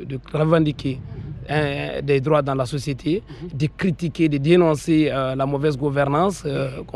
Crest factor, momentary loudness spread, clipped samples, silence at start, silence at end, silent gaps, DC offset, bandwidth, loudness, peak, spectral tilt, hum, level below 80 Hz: 16 dB; 10 LU; under 0.1%; 0 s; 0.05 s; none; under 0.1%; 12.5 kHz; -21 LUFS; -4 dBFS; -7 dB/octave; none; -44 dBFS